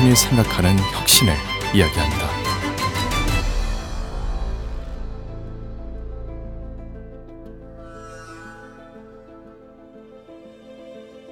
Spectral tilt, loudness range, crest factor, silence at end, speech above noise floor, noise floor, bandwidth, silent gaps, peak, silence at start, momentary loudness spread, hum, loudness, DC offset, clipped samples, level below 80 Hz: -4 dB/octave; 23 LU; 22 dB; 0 s; 27 dB; -44 dBFS; over 20 kHz; none; 0 dBFS; 0 s; 26 LU; none; -19 LUFS; under 0.1%; under 0.1%; -30 dBFS